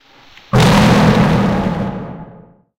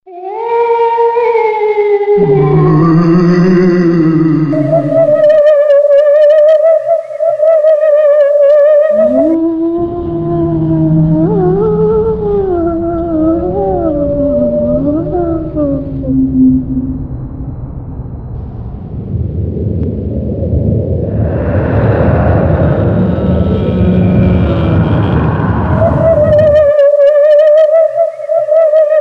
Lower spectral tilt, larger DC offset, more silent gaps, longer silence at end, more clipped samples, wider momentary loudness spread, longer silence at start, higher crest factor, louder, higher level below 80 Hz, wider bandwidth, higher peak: second, -6 dB/octave vs -10.5 dB/octave; neither; neither; first, 0.5 s vs 0 s; neither; first, 18 LU vs 10 LU; first, 0.55 s vs 0.05 s; first, 14 dB vs 8 dB; second, -13 LUFS vs -10 LUFS; about the same, -30 dBFS vs -26 dBFS; first, 16.5 kHz vs 6.4 kHz; about the same, 0 dBFS vs -2 dBFS